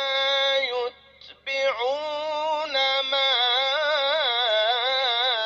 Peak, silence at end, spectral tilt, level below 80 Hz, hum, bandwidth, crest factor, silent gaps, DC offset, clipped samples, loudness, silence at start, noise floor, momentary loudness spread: -12 dBFS; 0 s; 0 dB/octave; -70 dBFS; none; 7.2 kHz; 12 dB; none; under 0.1%; under 0.1%; -22 LUFS; 0 s; -49 dBFS; 8 LU